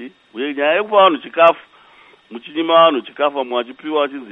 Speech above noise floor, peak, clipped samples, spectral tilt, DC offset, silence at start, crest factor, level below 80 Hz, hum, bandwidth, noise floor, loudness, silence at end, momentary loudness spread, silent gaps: 32 dB; 0 dBFS; under 0.1%; -6 dB/octave; under 0.1%; 0 s; 16 dB; -74 dBFS; none; 3.9 kHz; -48 dBFS; -16 LUFS; 0 s; 16 LU; none